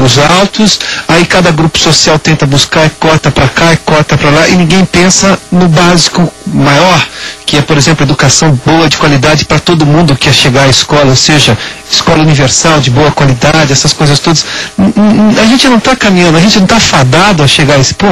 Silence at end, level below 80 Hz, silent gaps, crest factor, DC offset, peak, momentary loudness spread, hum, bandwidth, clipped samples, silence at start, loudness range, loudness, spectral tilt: 0 s; -28 dBFS; none; 6 dB; under 0.1%; 0 dBFS; 4 LU; none; 16 kHz; 2%; 0 s; 1 LU; -5 LUFS; -4 dB/octave